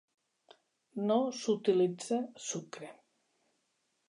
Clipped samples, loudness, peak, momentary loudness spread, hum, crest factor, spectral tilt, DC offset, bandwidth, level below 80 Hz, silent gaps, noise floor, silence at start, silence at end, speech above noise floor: under 0.1%; -33 LUFS; -18 dBFS; 18 LU; none; 18 dB; -5 dB/octave; under 0.1%; 11 kHz; under -90 dBFS; none; -79 dBFS; 0.95 s; 1.15 s; 47 dB